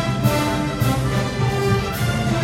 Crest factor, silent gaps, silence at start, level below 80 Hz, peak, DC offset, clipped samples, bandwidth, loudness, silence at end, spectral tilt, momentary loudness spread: 16 dB; none; 0 s; -34 dBFS; -4 dBFS; under 0.1%; under 0.1%; 16.5 kHz; -20 LUFS; 0 s; -6 dB/octave; 2 LU